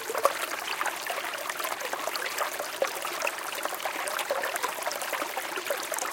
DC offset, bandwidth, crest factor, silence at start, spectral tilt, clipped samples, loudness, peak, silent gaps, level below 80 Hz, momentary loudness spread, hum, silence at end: under 0.1%; 17 kHz; 26 dB; 0 s; 0.5 dB/octave; under 0.1%; -31 LUFS; -6 dBFS; none; -78 dBFS; 3 LU; none; 0 s